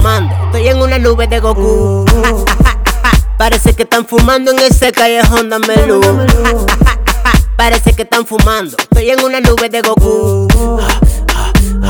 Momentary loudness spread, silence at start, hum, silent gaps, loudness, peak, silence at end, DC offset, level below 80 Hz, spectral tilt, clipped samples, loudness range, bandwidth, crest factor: 4 LU; 0 s; none; none; -10 LUFS; 0 dBFS; 0 s; under 0.1%; -12 dBFS; -5 dB/octave; 0.3%; 2 LU; over 20 kHz; 8 dB